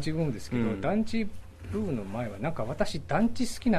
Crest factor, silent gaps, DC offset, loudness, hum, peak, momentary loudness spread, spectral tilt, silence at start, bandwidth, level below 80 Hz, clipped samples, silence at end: 18 dB; none; under 0.1%; -31 LUFS; none; -12 dBFS; 7 LU; -6.5 dB/octave; 0 s; 14 kHz; -46 dBFS; under 0.1%; 0 s